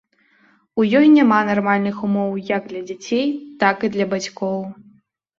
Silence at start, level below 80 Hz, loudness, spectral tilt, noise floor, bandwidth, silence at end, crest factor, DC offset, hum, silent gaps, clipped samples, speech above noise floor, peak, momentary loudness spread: 0.75 s; -64 dBFS; -18 LUFS; -6 dB/octave; -57 dBFS; 7.6 kHz; 0.65 s; 18 dB; under 0.1%; none; none; under 0.1%; 39 dB; -2 dBFS; 15 LU